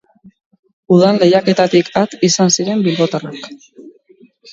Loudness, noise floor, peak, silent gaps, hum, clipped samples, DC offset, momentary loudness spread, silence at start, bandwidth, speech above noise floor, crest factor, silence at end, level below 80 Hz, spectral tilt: -13 LUFS; -48 dBFS; 0 dBFS; none; none; under 0.1%; under 0.1%; 14 LU; 0.9 s; 7.8 kHz; 35 dB; 14 dB; 0.65 s; -60 dBFS; -4.5 dB/octave